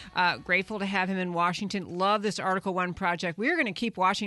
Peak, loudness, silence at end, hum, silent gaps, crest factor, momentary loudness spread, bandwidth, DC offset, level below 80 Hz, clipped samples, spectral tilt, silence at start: -12 dBFS; -28 LUFS; 0 s; none; none; 16 dB; 3 LU; 11.5 kHz; under 0.1%; -60 dBFS; under 0.1%; -4.5 dB/octave; 0 s